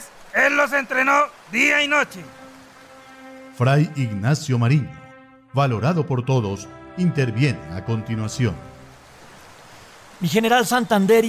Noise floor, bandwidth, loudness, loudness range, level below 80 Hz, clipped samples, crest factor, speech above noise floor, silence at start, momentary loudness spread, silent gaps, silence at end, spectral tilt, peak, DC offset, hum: -46 dBFS; 16 kHz; -20 LUFS; 5 LU; -50 dBFS; under 0.1%; 16 dB; 27 dB; 0 s; 13 LU; none; 0 s; -5.5 dB/octave; -6 dBFS; under 0.1%; none